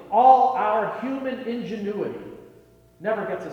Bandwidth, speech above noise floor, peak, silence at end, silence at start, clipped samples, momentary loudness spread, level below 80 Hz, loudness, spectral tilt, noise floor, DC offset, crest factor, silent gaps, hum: 6.6 kHz; 31 dB; -2 dBFS; 0 s; 0 s; under 0.1%; 16 LU; -64 dBFS; -23 LUFS; -7 dB/octave; -53 dBFS; under 0.1%; 20 dB; none; none